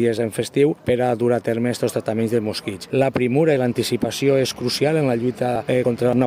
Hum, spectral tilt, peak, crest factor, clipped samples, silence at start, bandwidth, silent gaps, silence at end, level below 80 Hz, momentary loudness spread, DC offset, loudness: none; -6 dB/octave; -6 dBFS; 14 dB; under 0.1%; 0 s; 16 kHz; none; 0 s; -56 dBFS; 4 LU; under 0.1%; -20 LUFS